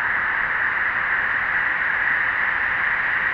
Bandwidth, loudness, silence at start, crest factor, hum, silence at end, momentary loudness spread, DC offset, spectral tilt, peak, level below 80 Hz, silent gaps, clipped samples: 6.8 kHz; -20 LUFS; 0 s; 12 dB; none; 0 s; 1 LU; under 0.1%; -4.5 dB/octave; -8 dBFS; -50 dBFS; none; under 0.1%